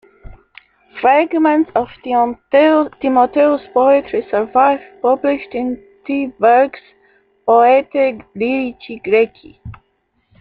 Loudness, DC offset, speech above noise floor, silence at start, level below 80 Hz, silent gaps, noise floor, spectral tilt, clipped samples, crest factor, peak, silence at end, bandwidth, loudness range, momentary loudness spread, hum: -15 LUFS; under 0.1%; 50 dB; 0.3 s; -50 dBFS; none; -64 dBFS; -8 dB/octave; under 0.1%; 14 dB; 0 dBFS; 0.7 s; 4.8 kHz; 3 LU; 10 LU; none